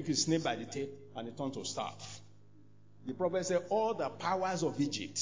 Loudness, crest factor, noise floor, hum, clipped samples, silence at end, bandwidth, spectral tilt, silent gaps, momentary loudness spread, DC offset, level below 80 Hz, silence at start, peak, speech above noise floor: -35 LUFS; 18 dB; -62 dBFS; none; under 0.1%; 0 s; 7.8 kHz; -4 dB/octave; none; 14 LU; 0.1%; -76 dBFS; 0 s; -18 dBFS; 27 dB